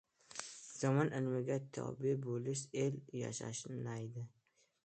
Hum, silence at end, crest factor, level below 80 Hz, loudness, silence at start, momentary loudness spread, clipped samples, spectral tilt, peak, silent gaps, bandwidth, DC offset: none; 0.6 s; 20 dB; -78 dBFS; -40 LUFS; 0.3 s; 13 LU; under 0.1%; -6 dB/octave; -20 dBFS; none; 9 kHz; under 0.1%